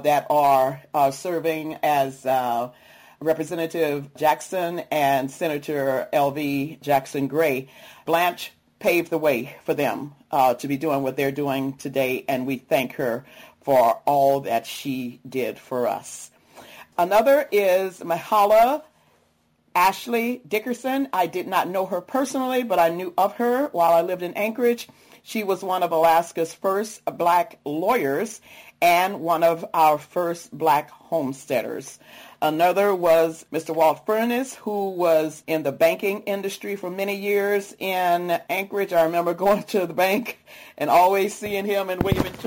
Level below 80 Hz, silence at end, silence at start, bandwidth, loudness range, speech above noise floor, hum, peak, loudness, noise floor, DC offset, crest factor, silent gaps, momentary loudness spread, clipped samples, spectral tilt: -56 dBFS; 0 s; 0 s; 17 kHz; 3 LU; 42 dB; none; -8 dBFS; -22 LUFS; -64 dBFS; under 0.1%; 14 dB; none; 10 LU; under 0.1%; -5 dB/octave